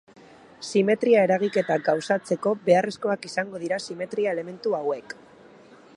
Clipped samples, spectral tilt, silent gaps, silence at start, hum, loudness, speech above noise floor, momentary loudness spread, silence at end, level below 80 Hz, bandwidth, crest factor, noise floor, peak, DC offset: under 0.1%; -5.5 dB/octave; none; 0.6 s; none; -24 LUFS; 26 dB; 11 LU; 0.85 s; -74 dBFS; 11.5 kHz; 20 dB; -50 dBFS; -6 dBFS; under 0.1%